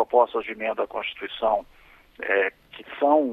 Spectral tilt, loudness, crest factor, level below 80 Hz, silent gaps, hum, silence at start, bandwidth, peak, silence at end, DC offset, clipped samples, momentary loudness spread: -5.5 dB/octave; -25 LUFS; 20 dB; -58 dBFS; none; none; 0 s; 4.6 kHz; -6 dBFS; 0 s; under 0.1%; under 0.1%; 12 LU